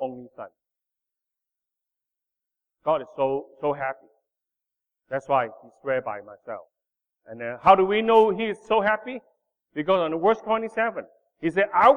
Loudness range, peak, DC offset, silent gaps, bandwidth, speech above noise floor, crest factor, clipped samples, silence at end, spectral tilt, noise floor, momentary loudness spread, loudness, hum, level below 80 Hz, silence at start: 9 LU; -2 dBFS; under 0.1%; none; 9.8 kHz; 64 dB; 22 dB; under 0.1%; 0 s; -6.5 dB/octave; -87 dBFS; 20 LU; -24 LUFS; none; -62 dBFS; 0 s